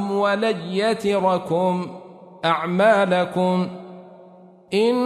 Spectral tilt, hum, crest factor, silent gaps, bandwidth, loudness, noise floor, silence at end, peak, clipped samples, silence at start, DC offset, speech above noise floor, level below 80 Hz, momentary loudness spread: -6 dB/octave; none; 16 dB; none; 13 kHz; -21 LUFS; -47 dBFS; 0 s; -4 dBFS; under 0.1%; 0 s; under 0.1%; 27 dB; -66 dBFS; 13 LU